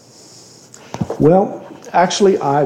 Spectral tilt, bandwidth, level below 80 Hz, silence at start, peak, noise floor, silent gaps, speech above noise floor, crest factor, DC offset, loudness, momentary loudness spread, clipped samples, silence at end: -5.5 dB/octave; 10 kHz; -50 dBFS; 0.95 s; -2 dBFS; -42 dBFS; none; 29 dB; 14 dB; under 0.1%; -15 LUFS; 16 LU; under 0.1%; 0 s